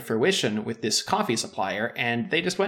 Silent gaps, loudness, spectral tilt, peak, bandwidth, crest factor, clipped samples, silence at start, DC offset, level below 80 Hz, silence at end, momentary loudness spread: none; -25 LUFS; -3.5 dB/octave; -8 dBFS; 18 kHz; 16 dB; under 0.1%; 0 s; under 0.1%; -68 dBFS; 0 s; 5 LU